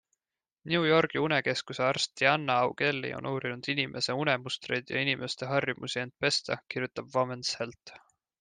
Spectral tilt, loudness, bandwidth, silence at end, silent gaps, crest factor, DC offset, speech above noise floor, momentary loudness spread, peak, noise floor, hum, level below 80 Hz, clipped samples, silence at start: -4 dB/octave; -29 LUFS; 10 kHz; 0.45 s; none; 22 dB; under 0.1%; over 60 dB; 9 LU; -8 dBFS; under -90 dBFS; none; -72 dBFS; under 0.1%; 0.65 s